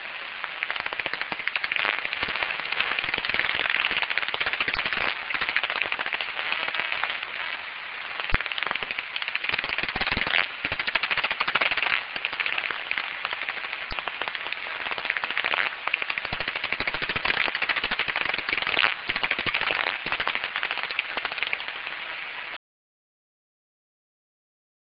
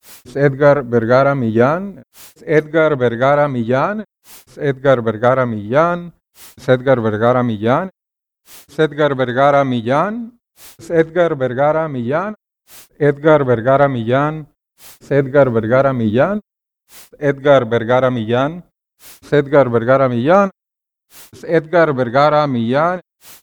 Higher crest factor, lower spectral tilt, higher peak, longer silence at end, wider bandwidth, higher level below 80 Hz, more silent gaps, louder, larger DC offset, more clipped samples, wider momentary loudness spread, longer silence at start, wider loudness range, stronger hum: first, 26 dB vs 16 dB; second, 1.5 dB/octave vs -7.5 dB/octave; about the same, -2 dBFS vs 0 dBFS; first, 2.45 s vs 0.1 s; second, 5.6 kHz vs over 20 kHz; about the same, -50 dBFS vs -52 dBFS; neither; second, -26 LUFS vs -15 LUFS; neither; neither; about the same, 7 LU vs 9 LU; about the same, 0 s vs 0.1 s; about the same, 4 LU vs 3 LU; neither